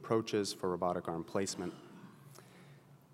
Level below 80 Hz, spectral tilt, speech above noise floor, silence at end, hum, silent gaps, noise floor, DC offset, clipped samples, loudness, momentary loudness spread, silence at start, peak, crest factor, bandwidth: -80 dBFS; -5 dB/octave; 23 dB; 0.2 s; none; none; -59 dBFS; under 0.1%; under 0.1%; -37 LUFS; 23 LU; 0 s; -18 dBFS; 20 dB; 16 kHz